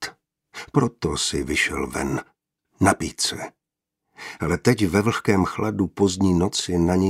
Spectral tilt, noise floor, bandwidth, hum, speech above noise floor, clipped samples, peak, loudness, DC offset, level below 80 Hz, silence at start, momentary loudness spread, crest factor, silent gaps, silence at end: -5 dB/octave; -83 dBFS; 16 kHz; none; 61 dB; under 0.1%; 0 dBFS; -22 LUFS; under 0.1%; -44 dBFS; 0 s; 14 LU; 22 dB; none; 0 s